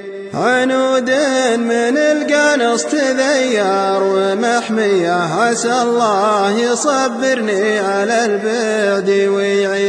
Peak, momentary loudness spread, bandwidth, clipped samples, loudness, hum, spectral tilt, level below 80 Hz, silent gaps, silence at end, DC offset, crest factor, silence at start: -2 dBFS; 2 LU; 11 kHz; under 0.1%; -14 LUFS; none; -3.5 dB/octave; -62 dBFS; none; 0 s; under 0.1%; 12 dB; 0 s